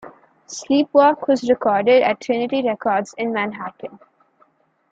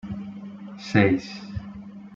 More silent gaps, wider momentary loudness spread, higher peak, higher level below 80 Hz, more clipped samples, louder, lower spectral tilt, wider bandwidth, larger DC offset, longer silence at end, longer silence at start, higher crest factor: neither; about the same, 18 LU vs 19 LU; about the same, -2 dBFS vs -4 dBFS; second, -64 dBFS vs -52 dBFS; neither; first, -18 LUFS vs -25 LUFS; second, -4.5 dB/octave vs -7 dB/octave; about the same, 7.8 kHz vs 7.6 kHz; neither; first, 0.95 s vs 0 s; about the same, 0.05 s vs 0.05 s; second, 18 dB vs 24 dB